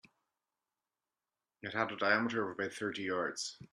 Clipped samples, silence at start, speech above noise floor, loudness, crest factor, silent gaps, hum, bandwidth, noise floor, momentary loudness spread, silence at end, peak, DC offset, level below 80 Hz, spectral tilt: under 0.1%; 1.65 s; over 54 dB; -35 LUFS; 22 dB; none; none; 13 kHz; under -90 dBFS; 10 LU; 0.1 s; -16 dBFS; under 0.1%; -80 dBFS; -3.5 dB/octave